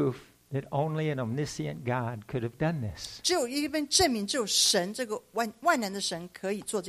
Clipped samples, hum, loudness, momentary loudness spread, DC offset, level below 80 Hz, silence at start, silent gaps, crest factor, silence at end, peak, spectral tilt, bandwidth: under 0.1%; none; -29 LUFS; 11 LU; under 0.1%; -58 dBFS; 0 s; none; 20 dB; 0 s; -10 dBFS; -3.5 dB/octave; 15.5 kHz